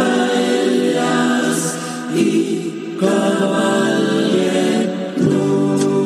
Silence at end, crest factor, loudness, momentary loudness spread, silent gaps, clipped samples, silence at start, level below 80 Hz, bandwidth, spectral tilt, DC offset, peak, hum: 0 s; 14 dB; -17 LUFS; 5 LU; none; under 0.1%; 0 s; -66 dBFS; 14.5 kHz; -5 dB/octave; under 0.1%; -2 dBFS; none